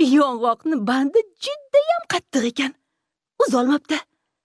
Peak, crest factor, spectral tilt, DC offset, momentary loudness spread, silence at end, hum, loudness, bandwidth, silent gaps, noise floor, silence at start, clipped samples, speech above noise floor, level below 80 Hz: -6 dBFS; 16 dB; -4 dB/octave; under 0.1%; 9 LU; 0.45 s; none; -21 LUFS; 11 kHz; none; -80 dBFS; 0 s; under 0.1%; 60 dB; -72 dBFS